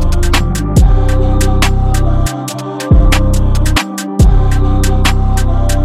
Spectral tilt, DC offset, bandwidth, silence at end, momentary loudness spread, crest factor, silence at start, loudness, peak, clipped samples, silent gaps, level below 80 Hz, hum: -5.5 dB/octave; 3%; 15 kHz; 0 s; 5 LU; 10 dB; 0 s; -13 LUFS; 0 dBFS; under 0.1%; none; -12 dBFS; none